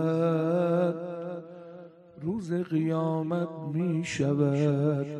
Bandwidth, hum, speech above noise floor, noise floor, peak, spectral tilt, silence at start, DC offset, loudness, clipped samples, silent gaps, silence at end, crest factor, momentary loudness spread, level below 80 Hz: 10 kHz; none; 21 dB; -48 dBFS; -14 dBFS; -8 dB/octave; 0 s; under 0.1%; -28 LUFS; under 0.1%; none; 0 s; 14 dB; 14 LU; -68 dBFS